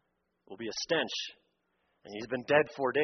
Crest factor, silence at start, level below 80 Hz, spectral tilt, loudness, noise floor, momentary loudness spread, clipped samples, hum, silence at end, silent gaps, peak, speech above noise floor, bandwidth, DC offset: 22 dB; 0.5 s; -74 dBFS; -2 dB/octave; -32 LUFS; -77 dBFS; 16 LU; under 0.1%; none; 0 s; none; -10 dBFS; 45 dB; 6.4 kHz; under 0.1%